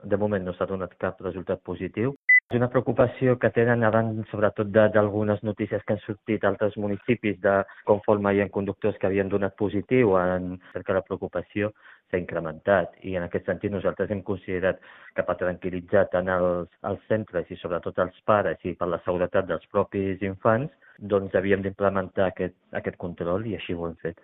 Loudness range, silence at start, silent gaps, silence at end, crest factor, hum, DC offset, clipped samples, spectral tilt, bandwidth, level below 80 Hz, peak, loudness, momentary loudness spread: 5 LU; 0.05 s; 2.16-2.28 s, 2.43-2.48 s; 0.1 s; 22 dB; none; under 0.1%; under 0.1%; -6 dB/octave; 3.9 kHz; -58 dBFS; -4 dBFS; -26 LUFS; 10 LU